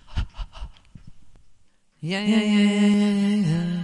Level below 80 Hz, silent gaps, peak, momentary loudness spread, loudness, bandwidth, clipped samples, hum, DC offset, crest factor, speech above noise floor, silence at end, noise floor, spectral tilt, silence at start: -40 dBFS; none; -8 dBFS; 21 LU; -21 LUFS; 11 kHz; under 0.1%; none; under 0.1%; 14 dB; 35 dB; 0 s; -54 dBFS; -6.5 dB/octave; 0.05 s